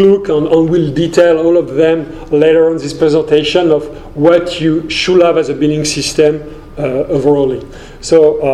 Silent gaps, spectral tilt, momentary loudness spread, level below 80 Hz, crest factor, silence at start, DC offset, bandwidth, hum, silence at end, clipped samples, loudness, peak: none; -5.5 dB/octave; 8 LU; -36 dBFS; 10 dB; 0 s; under 0.1%; 12.5 kHz; none; 0 s; 0.3%; -11 LUFS; 0 dBFS